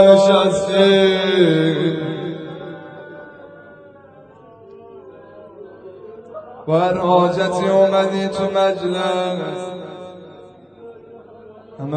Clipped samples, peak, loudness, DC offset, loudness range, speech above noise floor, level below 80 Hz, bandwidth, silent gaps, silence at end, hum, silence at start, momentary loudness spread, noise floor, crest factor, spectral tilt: under 0.1%; 0 dBFS; -16 LUFS; under 0.1%; 22 LU; 29 dB; -58 dBFS; 9.2 kHz; none; 0 s; none; 0 s; 25 LU; -44 dBFS; 18 dB; -6 dB/octave